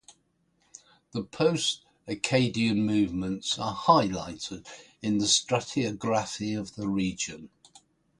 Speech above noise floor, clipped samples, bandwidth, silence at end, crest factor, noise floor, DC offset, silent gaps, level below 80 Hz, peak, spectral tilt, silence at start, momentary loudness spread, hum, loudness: 43 dB; under 0.1%; 11.5 kHz; 0.75 s; 22 dB; -71 dBFS; under 0.1%; none; -58 dBFS; -6 dBFS; -4 dB/octave; 0.1 s; 14 LU; none; -28 LUFS